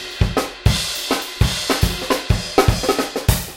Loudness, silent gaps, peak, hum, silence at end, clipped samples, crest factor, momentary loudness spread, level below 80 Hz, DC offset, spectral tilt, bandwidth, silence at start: -19 LUFS; none; 0 dBFS; none; 0 s; under 0.1%; 18 dB; 4 LU; -26 dBFS; under 0.1%; -4.5 dB/octave; 17 kHz; 0 s